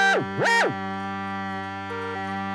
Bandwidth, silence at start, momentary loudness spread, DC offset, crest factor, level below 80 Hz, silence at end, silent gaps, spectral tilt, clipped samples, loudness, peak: 14 kHz; 0 s; 11 LU; under 0.1%; 16 dB; -72 dBFS; 0 s; none; -4 dB/octave; under 0.1%; -25 LUFS; -10 dBFS